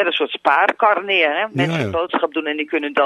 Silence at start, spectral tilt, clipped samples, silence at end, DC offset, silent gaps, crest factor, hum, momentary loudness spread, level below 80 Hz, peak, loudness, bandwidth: 0 s; -6 dB/octave; under 0.1%; 0 s; under 0.1%; none; 16 dB; none; 6 LU; -52 dBFS; -2 dBFS; -18 LUFS; 12 kHz